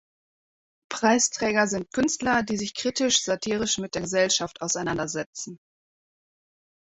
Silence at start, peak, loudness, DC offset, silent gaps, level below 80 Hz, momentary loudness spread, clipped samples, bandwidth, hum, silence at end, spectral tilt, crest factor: 0.9 s; -6 dBFS; -24 LUFS; under 0.1%; 5.26-5.33 s; -58 dBFS; 9 LU; under 0.1%; 8.4 kHz; none; 1.3 s; -2.5 dB/octave; 22 dB